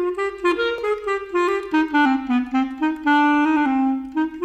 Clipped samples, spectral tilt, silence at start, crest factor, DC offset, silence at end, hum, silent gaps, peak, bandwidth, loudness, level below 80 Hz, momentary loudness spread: under 0.1%; -4.5 dB/octave; 0 s; 12 dB; under 0.1%; 0 s; none; none; -8 dBFS; 9 kHz; -20 LUFS; -54 dBFS; 7 LU